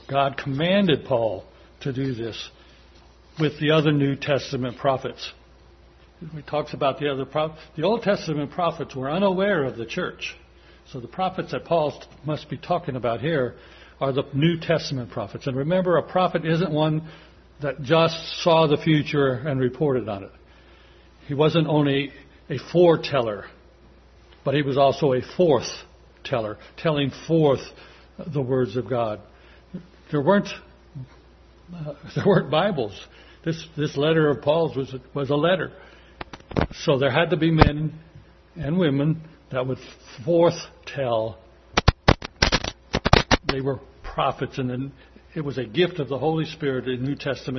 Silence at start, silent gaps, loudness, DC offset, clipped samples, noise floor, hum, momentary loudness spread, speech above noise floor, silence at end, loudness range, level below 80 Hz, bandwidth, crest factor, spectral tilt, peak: 0.1 s; none; -23 LUFS; under 0.1%; under 0.1%; -51 dBFS; none; 16 LU; 28 dB; 0 s; 5 LU; -42 dBFS; 6.4 kHz; 24 dB; -6.5 dB/octave; 0 dBFS